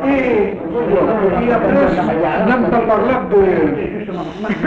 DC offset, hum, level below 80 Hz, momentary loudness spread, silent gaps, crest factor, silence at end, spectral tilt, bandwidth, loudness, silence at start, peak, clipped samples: under 0.1%; none; -38 dBFS; 8 LU; none; 12 dB; 0 s; -8.5 dB/octave; 7.2 kHz; -15 LUFS; 0 s; -2 dBFS; under 0.1%